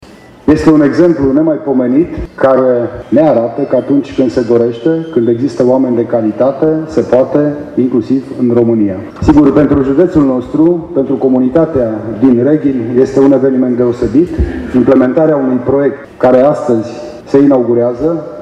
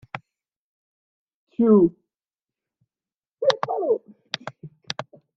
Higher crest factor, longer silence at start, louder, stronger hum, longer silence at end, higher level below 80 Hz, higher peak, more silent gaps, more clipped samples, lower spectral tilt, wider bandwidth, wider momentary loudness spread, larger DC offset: second, 10 dB vs 24 dB; first, 0.45 s vs 0.15 s; first, -10 LUFS vs -23 LUFS; neither; second, 0 s vs 0.35 s; first, -32 dBFS vs -66 dBFS; about the same, 0 dBFS vs -2 dBFS; second, none vs 0.56-1.27 s, 1.34-1.47 s, 3.16-3.21 s, 3.31-3.35 s; first, 0.4% vs under 0.1%; first, -9 dB/octave vs -6.5 dB/octave; first, 8.6 kHz vs 7.4 kHz; second, 6 LU vs 21 LU; neither